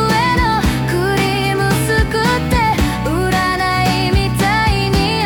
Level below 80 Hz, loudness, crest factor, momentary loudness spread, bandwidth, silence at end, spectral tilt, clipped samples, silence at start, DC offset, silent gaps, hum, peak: -24 dBFS; -15 LUFS; 10 dB; 2 LU; 19.5 kHz; 0 s; -5 dB/octave; under 0.1%; 0 s; under 0.1%; none; none; -4 dBFS